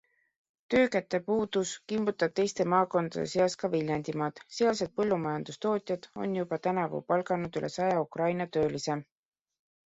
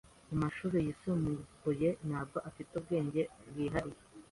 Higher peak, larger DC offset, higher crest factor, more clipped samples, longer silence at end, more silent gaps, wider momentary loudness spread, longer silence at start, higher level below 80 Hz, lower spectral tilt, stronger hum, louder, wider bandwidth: first, -12 dBFS vs -20 dBFS; neither; about the same, 20 dB vs 16 dB; neither; first, 0.85 s vs 0.05 s; neither; about the same, 7 LU vs 9 LU; first, 0.7 s vs 0.3 s; second, -66 dBFS vs -58 dBFS; second, -5.5 dB/octave vs -8 dB/octave; neither; first, -30 LUFS vs -37 LUFS; second, 8 kHz vs 11.5 kHz